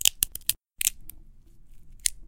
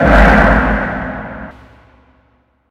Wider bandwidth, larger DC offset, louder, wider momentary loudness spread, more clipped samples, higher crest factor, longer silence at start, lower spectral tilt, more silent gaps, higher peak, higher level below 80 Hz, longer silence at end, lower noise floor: first, 17.5 kHz vs 8 kHz; neither; second, -27 LUFS vs -11 LUFS; second, 19 LU vs 22 LU; second, under 0.1% vs 0.3%; first, 30 dB vs 14 dB; about the same, 0 s vs 0 s; second, 2 dB/octave vs -7.5 dB/octave; neither; about the same, 0 dBFS vs 0 dBFS; second, -48 dBFS vs -18 dBFS; second, 0.05 s vs 1.2 s; second, -49 dBFS vs -56 dBFS